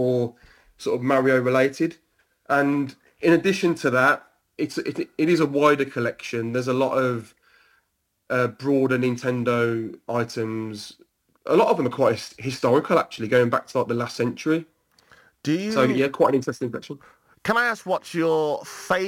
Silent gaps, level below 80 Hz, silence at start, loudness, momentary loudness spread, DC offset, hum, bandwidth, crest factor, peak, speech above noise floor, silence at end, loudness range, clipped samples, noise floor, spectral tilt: none; -66 dBFS; 0 s; -23 LUFS; 12 LU; under 0.1%; none; 17 kHz; 16 dB; -6 dBFS; 49 dB; 0 s; 3 LU; under 0.1%; -71 dBFS; -6 dB/octave